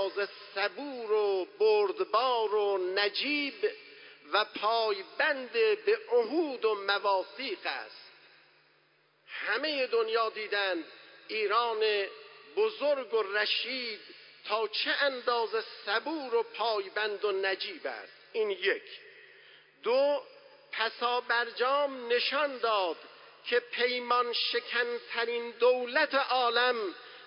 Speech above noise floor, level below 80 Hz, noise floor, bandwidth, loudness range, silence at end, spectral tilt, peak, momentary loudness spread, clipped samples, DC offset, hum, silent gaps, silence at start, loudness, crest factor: 38 dB; under -90 dBFS; -68 dBFS; 5.6 kHz; 4 LU; 0 s; -5 dB/octave; -12 dBFS; 11 LU; under 0.1%; under 0.1%; none; none; 0 s; -30 LUFS; 18 dB